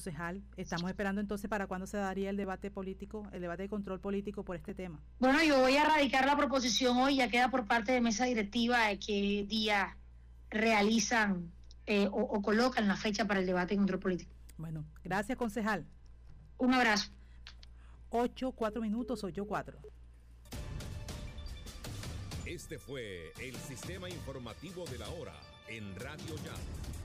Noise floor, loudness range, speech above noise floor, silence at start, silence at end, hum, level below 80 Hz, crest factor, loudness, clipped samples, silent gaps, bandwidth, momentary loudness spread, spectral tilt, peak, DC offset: -55 dBFS; 15 LU; 22 dB; 0 s; 0 s; none; -52 dBFS; 12 dB; -33 LUFS; under 0.1%; none; 15.5 kHz; 17 LU; -4.5 dB/octave; -22 dBFS; under 0.1%